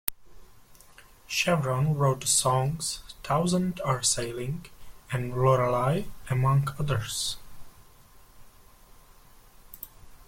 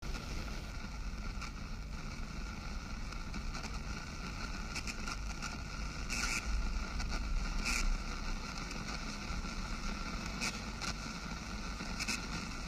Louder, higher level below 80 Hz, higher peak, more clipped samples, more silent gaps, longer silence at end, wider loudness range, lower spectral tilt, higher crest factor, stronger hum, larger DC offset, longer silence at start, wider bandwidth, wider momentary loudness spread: first, -27 LUFS vs -41 LUFS; second, -50 dBFS vs -42 dBFS; first, 0 dBFS vs -20 dBFS; neither; neither; about the same, 0.05 s vs 0 s; about the same, 7 LU vs 6 LU; about the same, -4.5 dB/octave vs -3.5 dB/octave; first, 28 dB vs 20 dB; neither; neither; about the same, 0.05 s vs 0 s; about the same, 16.5 kHz vs 15.5 kHz; first, 14 LU vs 8 LU